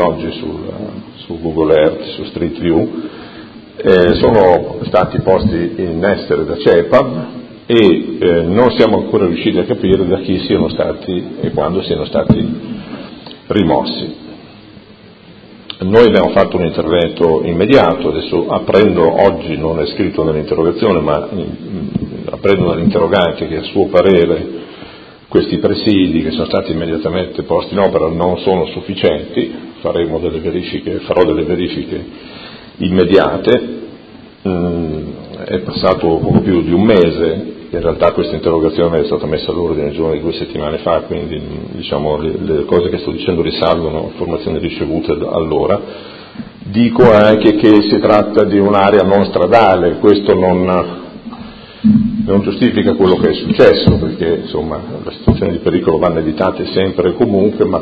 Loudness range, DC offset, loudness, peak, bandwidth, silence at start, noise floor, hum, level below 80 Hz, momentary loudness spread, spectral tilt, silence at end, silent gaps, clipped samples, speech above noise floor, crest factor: 6 LU; under 0.1%; -13 LUFS; 0 dBFS; 6.6 kHz; 0 s; -39 dBFS; none; -34 dBFS; 15 LU; -9 dB/octave; 0 s; none; 0.3%; 27 dB; 12 dB